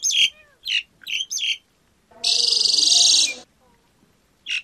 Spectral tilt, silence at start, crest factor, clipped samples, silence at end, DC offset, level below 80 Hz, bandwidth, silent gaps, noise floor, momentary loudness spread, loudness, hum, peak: 3.5 dB/octave; 0 s; 18 dB; under 0.1%; 0 s; under 0.1%; -66 dBFS; 15.5 kHz; none; -62 dBFS; 15 LU; -17 LUFS; none; -4 dBFS